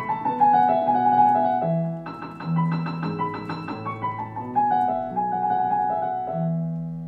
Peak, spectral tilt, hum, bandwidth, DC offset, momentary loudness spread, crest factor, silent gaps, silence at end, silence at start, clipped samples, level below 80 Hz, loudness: -8 dBFS; -9.5 dB/octave; none; 5.4 kHz; under 0.1%; 13 LU; 16 dB; none; 0 s; 0 s; under 0.1%; -60 dBFS; -23 LUFS